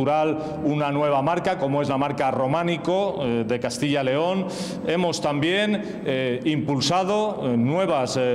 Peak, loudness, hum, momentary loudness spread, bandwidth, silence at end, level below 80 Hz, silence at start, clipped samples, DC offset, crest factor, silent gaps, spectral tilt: -10 dBFS; -23 LUFS; none; 4 LU; 14 kHz; 0 s; -58 dBFS; 0 s; under 0.1%; under 0.1%; 12 dB; none; -5.5 dB/octave